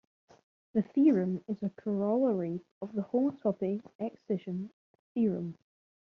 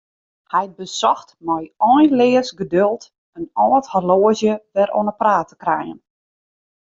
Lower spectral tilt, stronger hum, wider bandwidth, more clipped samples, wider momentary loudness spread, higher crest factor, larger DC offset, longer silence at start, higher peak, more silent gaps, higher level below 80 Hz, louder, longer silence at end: first, -10 dB/octave vs -5.5 dB/octave; neither; second, 6.2 kHz vs 7.8 kHz; neither; first, 14 LU vs 11 LU; about the same, 18 dB vs 16 dB; neither; first, 0.75 s vs 0.55 s; second, -14 dBFS vs -2 dBFS; first, 2.71-2.81 s, 3.95-3.99 s, 4.73-5.15 s vs 3.18-3.33 s; second, -76 dBFS vs -60 dBFS; second, -32 LUFS vs -18 LUFS; second, 0.5 s vs 0.9 s